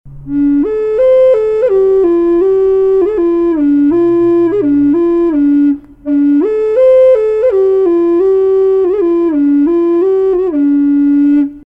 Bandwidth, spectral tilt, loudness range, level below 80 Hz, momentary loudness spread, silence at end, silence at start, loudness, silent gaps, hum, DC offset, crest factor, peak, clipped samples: 3.7 kHz; -9 dB/octave; 1 LU; -40 dBFS; 4 LU; 0.05 s; 0.05 s; -10 LUFS; none; none; under 0.1%; 8 dB; -2 dBFS; under 0.1%